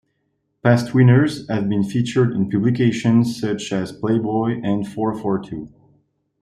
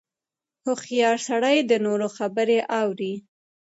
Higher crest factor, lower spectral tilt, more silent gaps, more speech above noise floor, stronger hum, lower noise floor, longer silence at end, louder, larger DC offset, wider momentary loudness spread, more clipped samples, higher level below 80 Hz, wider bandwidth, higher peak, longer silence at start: about the same, 16 dB vs 16 dB; first, -7.5 dB/octave vs -4 dB/octave; neither; second, 52 dB vs 67 dB; neither; second, -70 dBFS vs -89 dBFS; first, 0.75 s vs 0.55 s; first, -19 LUFS vs -23 LUFS; neither; about the same, 9 LU vs 10 LU; neither; first, -56 dBFS vs -78 dBFS; first, 12 kHz vs 8 kHz; first, -2 dBFS vs -8 dBFS; about the same, 0.65 s vs 0.65 s